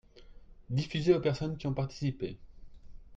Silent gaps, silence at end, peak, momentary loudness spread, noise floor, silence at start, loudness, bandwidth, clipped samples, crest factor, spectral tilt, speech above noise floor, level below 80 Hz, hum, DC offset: none; 0 s; -12 dBFS; 13 LU; -52 dBFS; 0.15 s; -32 LUFS; 7.8 kHz; under 0.1%; 22 dB; -7.5 dB/octave; 21 dB; -52 dBFS; none; under 0.1%